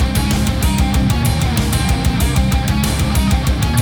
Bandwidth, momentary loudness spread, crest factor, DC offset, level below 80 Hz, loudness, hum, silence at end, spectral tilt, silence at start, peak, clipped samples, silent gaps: over 20 kHz; 1 LU; 12 dB; under 0.1%; -18 dBFS; -16 LUFS; none; 0 s; -5 dB/octave; 0 s; -2 dBFS; under 0.1%; none